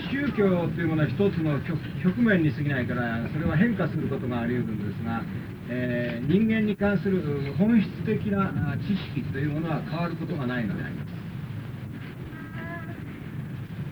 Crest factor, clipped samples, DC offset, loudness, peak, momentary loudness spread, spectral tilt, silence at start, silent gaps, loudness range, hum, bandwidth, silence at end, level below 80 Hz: 18 dB; under 0.1%; under 0.1%; -27 LUFS; -10 dBFS; 13 LU; -9 dB/octave; 0 s; none; 7 LU; none; over 20 kHz; 0 s; -50 dBFS